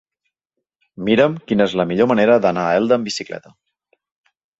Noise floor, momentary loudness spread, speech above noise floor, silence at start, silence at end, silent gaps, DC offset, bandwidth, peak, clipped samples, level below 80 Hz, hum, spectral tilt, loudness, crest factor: -80 dBFS; 13 LU; 63 dB; 1 s; 1.2 s; none; under 0.1%; 8 kHz; -2 dBFS; under 0.1%; -56 dBFS; none; -5.5 dB/octave; -17 LUFS; 18 dB